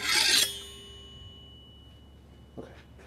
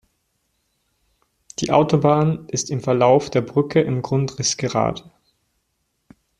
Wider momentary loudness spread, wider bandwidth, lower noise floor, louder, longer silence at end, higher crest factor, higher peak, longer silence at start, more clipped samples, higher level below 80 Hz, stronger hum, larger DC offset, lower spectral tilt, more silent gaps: first, 28 LU vs 9 LU; first, 16 kHz vs 11 kHz; second, -52 dBFS vs -72 dBFS; second, -23 LUFS vs -19 LUFS; second, 0 s vs 1.4 s; about the same, 22 dB vs 18 dB; second, -10 dBFS vs -2 dBFS; second, 0 s vs 1.6 s; neither; about the same, -54 dBFS vs -54 dBFS; neither; neither; second, 0.5 dB/octave vs -5.5 dB/octave; neither